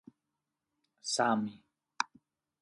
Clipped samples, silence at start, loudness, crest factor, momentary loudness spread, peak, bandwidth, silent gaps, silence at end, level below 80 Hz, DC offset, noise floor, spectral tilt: under 0.1%; 1.05 s; -34 LUFS; 26 dB; 12 LU; -12 dBFS; 11.5 kHz; none; 0.55 s; -80 dBFS; under 0.1%; -87 dBFS; -3 dB/octave